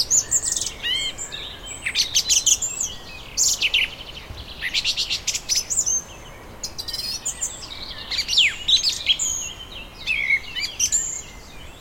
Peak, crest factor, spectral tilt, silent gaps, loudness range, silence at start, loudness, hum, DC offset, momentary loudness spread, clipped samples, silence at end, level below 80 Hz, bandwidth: -4 dBFS; 22 dB; 1.5 dB/octave; none; 3 LU; 0 s; -20 LUFS; none; under 0.1%; 18 LU; under 0.1%; 0 s; -44 dBFS; 17 kHz